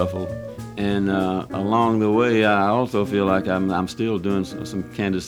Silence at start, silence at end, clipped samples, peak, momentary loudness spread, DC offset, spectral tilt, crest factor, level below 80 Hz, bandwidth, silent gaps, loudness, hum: 0 s; 0 s; under 0.1%; -4 dBFS; 12 LU; under 0.1%; -6.5 dB/octave; 16 dB; -50 dBFS; 14.5 kHz; none; -21 LUFS; none